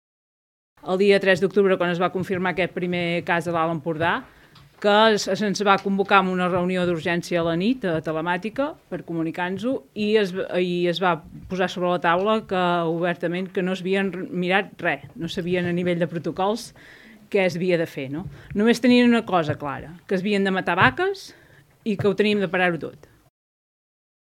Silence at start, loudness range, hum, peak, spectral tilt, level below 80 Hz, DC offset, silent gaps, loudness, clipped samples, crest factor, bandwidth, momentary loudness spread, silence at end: 0.85 s; 4 LU; none; 0 dBFS; -6 dB/octave; -58 dBFS; under 0.1%; none; -22 LUFS; under 0.1%; 22 dB; 15 kHz; 11 LU; 1.35 s